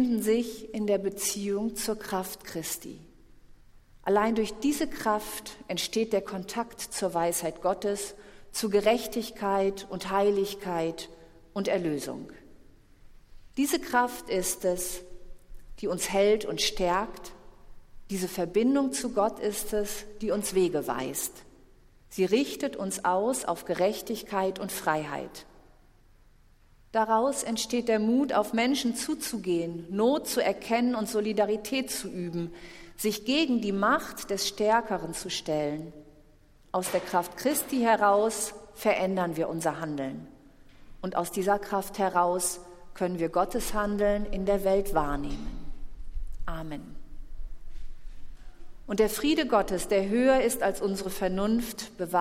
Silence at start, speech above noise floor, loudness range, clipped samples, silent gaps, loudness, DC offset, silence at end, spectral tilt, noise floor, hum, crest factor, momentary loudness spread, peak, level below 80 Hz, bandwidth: 0 s; 30 dB; 5 LU; under 0.1%; none; -29 LUFS; under 0.1%; 0 s; -4 dB/octave; -58 dBFS; none; 20 dB; 13 LU; -10 dBFS; -46 dBFS; 16.5 kHz